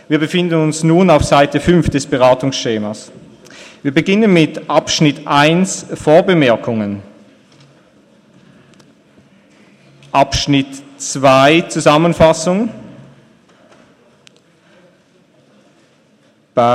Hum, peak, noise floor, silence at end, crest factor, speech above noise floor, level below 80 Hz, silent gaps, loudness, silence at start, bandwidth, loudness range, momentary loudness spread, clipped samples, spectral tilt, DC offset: none; 0 dBFS; -52 dBFS; 0 s; 14 dB; 40 dB; -38 dBFS; none; -13 LUFS; 0.1 s; 13.5 kHz; 10 LU; 12 LU; under 0.1%; -5 dB/octave; under 0.1%